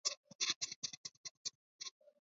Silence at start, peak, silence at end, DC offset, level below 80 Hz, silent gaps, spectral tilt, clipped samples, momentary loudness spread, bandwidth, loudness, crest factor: 0.05 s; -22 dBFS; 0.35 s; under 0.1%; under -90 dBFS; 0.17-0.23 s, 0.35-0.39 s, 0.56-0.61 s, 0.76-0.82 s, 0.97-1.04 s, 1.17-1.24 s, 1.31-1.45 s, 1.55-1.79 s; 2 dB/octave; under 0.1%; 13 LU; 7.6 kHz; -43 LUFS; 24 dB